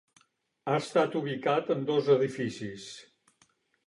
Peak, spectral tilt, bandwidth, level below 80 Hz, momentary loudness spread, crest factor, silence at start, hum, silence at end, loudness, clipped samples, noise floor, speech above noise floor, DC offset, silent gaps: -12 dBFS; -6 dB/octave; 11.5 kHz; -74 dBFS; 16 LU; 18 dB; 0.65 s; none; 0.85 s; -29 LUFS; under 0.1%; -69 dBFS; 40 dB; under 0.1%; none